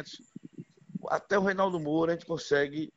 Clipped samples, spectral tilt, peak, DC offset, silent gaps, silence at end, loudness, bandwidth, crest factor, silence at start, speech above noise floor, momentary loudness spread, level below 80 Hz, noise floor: under 0.1%; -5.5 dB/octave; -14 dBFS; under 0.1%; none; 0.1 s; -29 LUFS; 8 kHz; 18 dB; 0 s; 20 dB; 21 LU; -66 dBFS; -49 dBFS